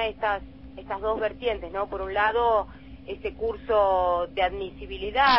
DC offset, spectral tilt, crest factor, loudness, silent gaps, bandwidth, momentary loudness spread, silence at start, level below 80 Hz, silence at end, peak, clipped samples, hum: 0.2%; -7.5 dB/octave; 18 dB; -26 LUFS; none; 5.8 kHz; 14 LU; 0 s; -44 dBFS; 0 s; -8 dBFS; under 0.1%; none